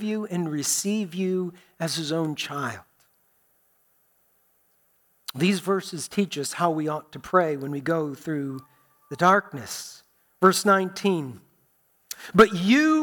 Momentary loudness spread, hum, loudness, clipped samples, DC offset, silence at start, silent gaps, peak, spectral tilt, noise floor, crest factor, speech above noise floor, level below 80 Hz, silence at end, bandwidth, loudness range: 16 LU; none; -24 LUFS; under 0.1%; under 0.1%; 0 s; none; -6 dBFS; -4.5 dB/octave; -66 dBFS; 20 dB; 42 dB; -62 dBFS; 0 s; 19 kHz; 9 LU